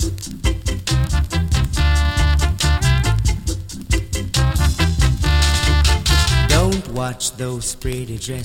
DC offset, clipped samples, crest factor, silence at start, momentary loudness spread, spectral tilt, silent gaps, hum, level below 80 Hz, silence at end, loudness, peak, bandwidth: under 0.1%; under 0.1%; 16 dB; 0 s; 9 LU; -4 dB/octave; none; none; -20 dBFS; 0 s; -18 LUFS; 0 dBFS; 16.5 kHz